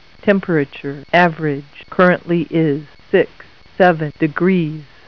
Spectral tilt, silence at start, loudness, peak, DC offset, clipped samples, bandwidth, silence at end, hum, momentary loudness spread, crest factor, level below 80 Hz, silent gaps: -8.5 dB/octave; 0.25 s; -17 LUFS; 0 dBFS; 0.5%; under 0.1%; 5.4 kHz; 0.25 s; none; 10 LU; 16 dB; -52 dBFS; none